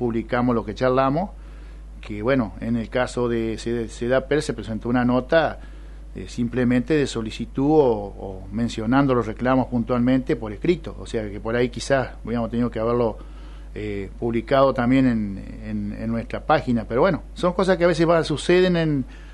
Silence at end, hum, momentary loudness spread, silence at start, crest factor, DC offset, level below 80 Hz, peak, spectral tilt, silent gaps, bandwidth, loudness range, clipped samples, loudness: 0 s; none; 14 LU; 0 s; 18 dB; under 0.1%; -38 dBFS; -4 dBFS; -6.5 dB/octave; none; 11.5 kHz; 3 LU; under 0.1%; -22 LUFS